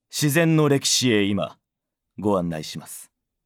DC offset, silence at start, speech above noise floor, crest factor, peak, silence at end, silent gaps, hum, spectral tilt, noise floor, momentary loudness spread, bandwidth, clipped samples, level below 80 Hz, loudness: under 0.1%; 0.15 s; 61 dB; 18 dB; -6 dBFS; 0.45 s; none; none; -4.5 dB/octave; -83 dBFS; 16 LU; 19 kHz; under 0.1%; -62 dBFS; -21 LUFS